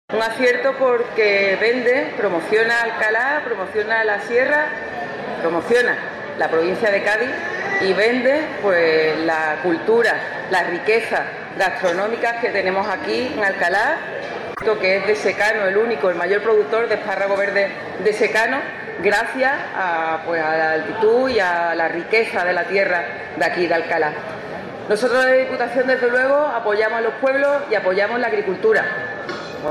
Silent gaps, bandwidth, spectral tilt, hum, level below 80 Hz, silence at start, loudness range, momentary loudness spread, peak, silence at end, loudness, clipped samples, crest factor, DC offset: none; 13 kHz; -4.5 dB/octave; none; -60 dBFS; 0.1 s; 2 LU; 7 LU; -4 dBFS; 0 s; -19 LUFS; under 0.1%; 14 dB; under 0.1%